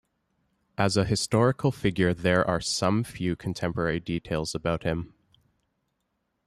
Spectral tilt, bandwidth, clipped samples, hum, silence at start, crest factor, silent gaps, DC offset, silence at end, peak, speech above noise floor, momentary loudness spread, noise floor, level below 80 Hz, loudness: -5.5 dB/octave; 13.5 kHz; under 0.1%; none; 0.8 s; 18 dB; none; under 0.1%; 1.4 s; -8 dBFS; 51 dB; 7 LU; -77 dBFS; -52 dBFS; -27 LUFS